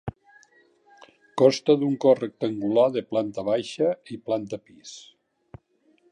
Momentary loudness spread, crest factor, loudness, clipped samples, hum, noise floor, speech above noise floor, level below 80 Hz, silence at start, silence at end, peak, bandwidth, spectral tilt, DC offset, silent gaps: 19 LU; 22 dB; -24 LUFS; under 0.1%; none; -64 dBFS; 41 dB; -60 dBFS; 0.05 s; 1.1 s; -4 dBFS; 10 kHz; -6 dB/octave; under 0.1%; none